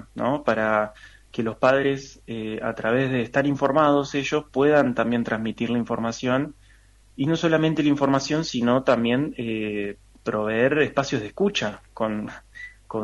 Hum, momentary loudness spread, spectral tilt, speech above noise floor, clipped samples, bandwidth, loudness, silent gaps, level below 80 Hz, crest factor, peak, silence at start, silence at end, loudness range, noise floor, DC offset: none; 12 LU; -6 dB/octave; 31 dB; under 0.1%; 11.5 kHz; -23 LUFS; none; -54 dBFS; 18 dB; -4 dBFS; 0 s; 0 s; 3 LU; -53 dBFS; under 0.1%